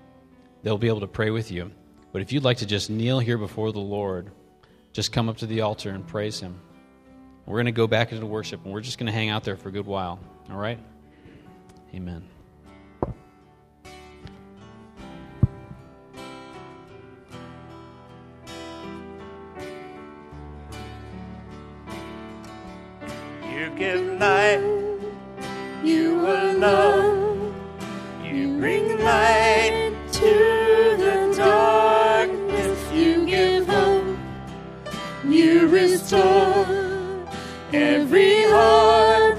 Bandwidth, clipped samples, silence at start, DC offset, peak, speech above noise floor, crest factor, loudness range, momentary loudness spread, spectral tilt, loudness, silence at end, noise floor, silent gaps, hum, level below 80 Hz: 14.5 kHz; under 0.1%; 0.65 s; under 0.1%; -2 dBFS; 29 dB; 20 dB; 21 LU; 23 LU; -5.5 dB/octave; -21 LUFS; 0 s; -55 dBFS; none; none; -46 dBFS